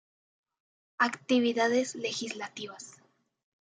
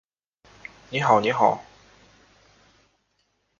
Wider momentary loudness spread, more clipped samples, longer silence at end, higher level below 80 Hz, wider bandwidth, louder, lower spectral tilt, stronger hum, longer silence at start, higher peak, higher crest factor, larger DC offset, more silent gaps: second, 16 LU vs 24 LU; neither; second, 0.85 s vs 1.95 s; second, -86 dBFS vs -64 dBFS; first, 9.4 kHz vs 7.6 kHz; second, -29 LUFS vs -22 LUFS; second, -3 dB/octave vs -5.5 dB/octave; neither; about the same, 1 s vs 0.9 s; second, -10 dBFS vs -4 dBFS; about the same, 22 dB vs 24 dB; neither; neither